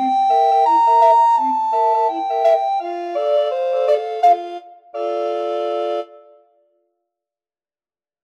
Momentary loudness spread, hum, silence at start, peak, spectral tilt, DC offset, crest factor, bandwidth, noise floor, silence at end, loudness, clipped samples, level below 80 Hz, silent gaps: 12 LU; none; 0 s; -4 dBFS; -2.5 dB/octave; under 0.1%; 14 dB; 9.8 kHz; under -90 dBFS; 2.1 s; -17 LUFS; under 0.1%; -88 dBFS; none